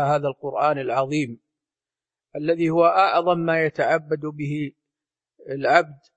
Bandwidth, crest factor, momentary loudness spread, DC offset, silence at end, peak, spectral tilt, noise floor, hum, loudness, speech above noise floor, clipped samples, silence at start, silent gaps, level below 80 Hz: 8.6 kHz; 22 dB; 12 LU; under 0.1%; 0.2 s; 0 dBFS; -6.5 dB/octave; under -90 dBFS; none; -22 LUFS; over 69 dB; under 0.1%; 0 s; none; -68 dBFS